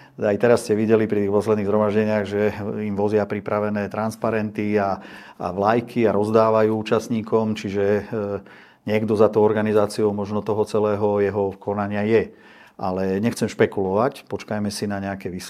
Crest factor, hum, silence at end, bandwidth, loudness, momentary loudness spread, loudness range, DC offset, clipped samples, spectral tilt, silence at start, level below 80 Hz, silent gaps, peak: 20 dB; none; 0 s; 14.5 kHz; -21 LUFS; 9 LU; 3 LU; under 0.1%; under 0.1%; -6.5 dB/octave; 0 s; -62 dBFS; none; -2 dBFS